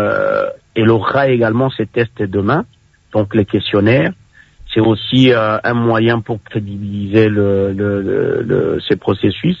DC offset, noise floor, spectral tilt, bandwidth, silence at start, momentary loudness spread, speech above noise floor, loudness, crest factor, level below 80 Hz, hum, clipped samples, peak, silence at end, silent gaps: under 0.1%; -40 dBFS; -8.5 dB/octave; 7.4 kHz; 0 s; 8 LU; 26 dB; -15 LUFS; 14 dB; -48 dBFS; none; under 0.1%; 0 dBFS; 0 s; none